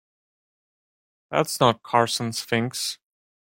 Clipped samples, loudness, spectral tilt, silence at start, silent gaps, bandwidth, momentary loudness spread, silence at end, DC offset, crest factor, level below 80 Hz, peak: under 0.1%; -23 LUFS; -4 dB/octave; 1.3 s; none; 16.5 kHz; 9 LU; 0.5 s; under 0.1%; 22 dB; -66 dBFS; -4 dBFS